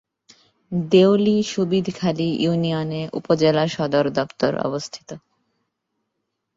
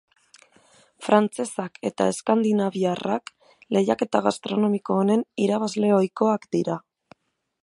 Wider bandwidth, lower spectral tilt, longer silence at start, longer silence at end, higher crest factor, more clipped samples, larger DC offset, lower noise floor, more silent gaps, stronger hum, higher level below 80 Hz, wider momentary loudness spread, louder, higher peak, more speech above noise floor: second, 7.8 kHz vs 11.5 kHz; about the same, -6.5 dB/octave vs -6 dB/octave; second, 0.7 s vs 1 s; first, 1.4 s vs 0.85 s; about the same, 18 dB vs 20 dB; neither; neither; first, -77 dBFS vs -64 dBFS; neither; neither; first, -60 dBFS vs -70 dBFS; first, 13 LU vs 9 LU; first, -20 LUFS vs -23 LUFS; about the same, -4 dBFS vs -2 dBFS; first, 57 dB vs 42 dB